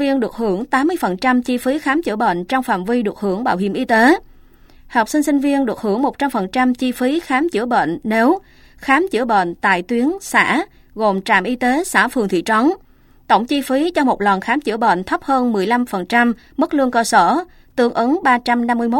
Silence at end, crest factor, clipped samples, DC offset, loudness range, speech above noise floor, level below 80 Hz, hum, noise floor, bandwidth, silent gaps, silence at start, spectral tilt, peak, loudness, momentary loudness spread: 0 s; 16 dB; under 0.1%; under 0.1%; 2 LU; 29 dB; -48 dBFS; none; -45 dBFS; 16.5 kHz; none; 0 s; -4.5 dB/octave; 0 dBFS; -17 LUFS; 5 LU